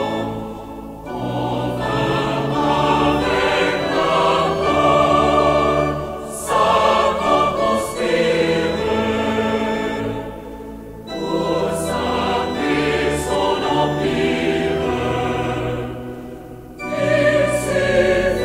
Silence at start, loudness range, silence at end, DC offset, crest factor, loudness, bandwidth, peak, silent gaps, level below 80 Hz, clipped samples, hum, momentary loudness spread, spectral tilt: 0 s; 6 LU; 0 s; under 0.1%; 16 dB; -18 LUFS; 16 kHz; -4 dBFS; none; -38 dBFS; under 0.1%; none; 15 LU; -5 dB/octave